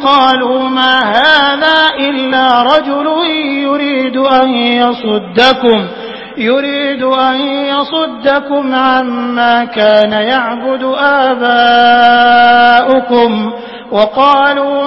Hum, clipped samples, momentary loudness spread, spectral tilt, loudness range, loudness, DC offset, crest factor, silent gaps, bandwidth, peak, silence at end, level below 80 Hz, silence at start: none; 0.3%; 8 LU; -5 dB/octave; 4 LU; -9 LUFS; under 0.1%; 10 dB; none; 8 kHz; 0 dBFS; 0 s; -50 dBFS; 0 s